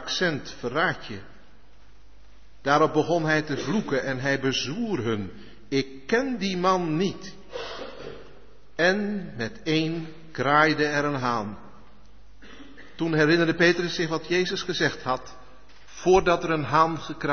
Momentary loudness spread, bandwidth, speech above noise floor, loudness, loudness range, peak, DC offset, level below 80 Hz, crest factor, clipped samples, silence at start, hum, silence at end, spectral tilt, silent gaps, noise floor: 17 LU; 6.6 kHz; 30 dB; -25 LUFS; 4 LU; -6 dBFS; 0.8%; -52 dBFS; 20 dB; under 0.1%; 0 s; none; 0 s; -5 dB/octave; none; -55 dBFS